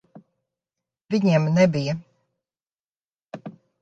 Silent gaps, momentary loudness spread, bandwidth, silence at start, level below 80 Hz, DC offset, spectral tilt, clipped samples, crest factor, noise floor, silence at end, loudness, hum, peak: 1.01-1.05 s, 2.81-2.95 s, 3.04-3.26 s; 22 LU; 7.8 kHz; 0.15 s; -66 dBFS; under 0.1%; -7 dB/octave; under 0.1%; 18 dB; under -90 dBFS; 0.3 s; -21 LUFS; none; -6 dBFS